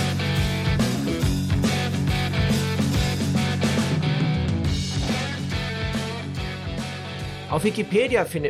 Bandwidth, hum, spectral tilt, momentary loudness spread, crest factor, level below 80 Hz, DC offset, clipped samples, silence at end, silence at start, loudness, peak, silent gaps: 15.5 kHz; none; -5.5 dB/octave; 8 LU; 16 dB; -36 dBFS; under 0.1%; under 0.1%; 0 s; 0 s; -24 LUFS; -8 dBFS; none